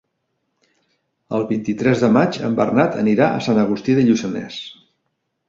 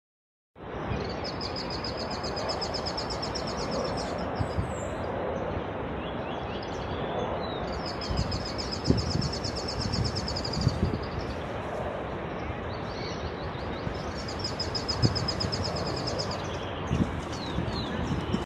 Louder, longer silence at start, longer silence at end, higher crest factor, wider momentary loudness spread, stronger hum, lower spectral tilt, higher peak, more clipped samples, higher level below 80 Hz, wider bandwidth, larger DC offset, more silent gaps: first, -18 LUFS vs -31 LUFS; first, 1.3 s vs 0.55 s; first, 0.75 s vs 0 s; second, 18 dB vs 24 dB; first, 11 LU vs 6 LU; neither; first, -7 dB/octave vs -5.5 dB/octave; first, -2 dBFS vs -8 dBFS; neither; second, -56 dBFS vs -42 dBFS; second, 7.6 kHz vs 12.5 kHz; neither; neither